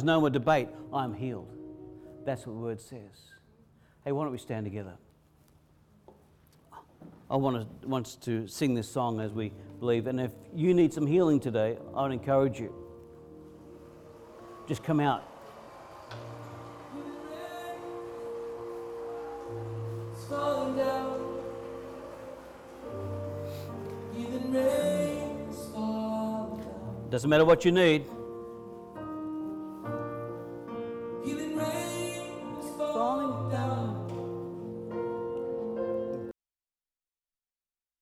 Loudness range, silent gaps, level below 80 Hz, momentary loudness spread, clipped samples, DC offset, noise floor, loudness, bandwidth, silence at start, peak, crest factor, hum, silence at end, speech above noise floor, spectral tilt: 12 LU; none; -62 dBFS; 20 LU; under 0.1%; under 0.1%; under -90 dBFS; -32 LUFS; 16 kHz; 0 s; -12 dBFS; 20 dB; none; 1.7 s; over 62 dB; -6.5 dB/octave